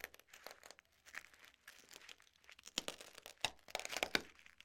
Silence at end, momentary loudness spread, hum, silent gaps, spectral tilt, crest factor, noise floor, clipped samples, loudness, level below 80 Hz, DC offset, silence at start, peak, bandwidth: 0 s; 21 LU; none; none; -0.5 dB/octave; 34 dB; -66 dBFS; under 0.1%; -45 LUFS; -76 dBFS; under 0.1%; 0 s; -14 dBFS; 16.5 kHz